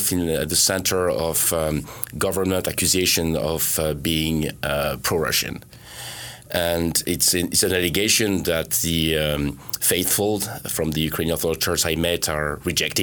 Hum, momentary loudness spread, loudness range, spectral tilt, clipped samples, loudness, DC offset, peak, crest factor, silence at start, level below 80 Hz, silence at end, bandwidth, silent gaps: none; 8 LU; 3 LU; -3 dB/octave; under 0.1%; -21 LUFS; under 0.1%; 0 dBFS; 22 dB; 0 s; -40 dBFS; 0 s; over 20 kHz; none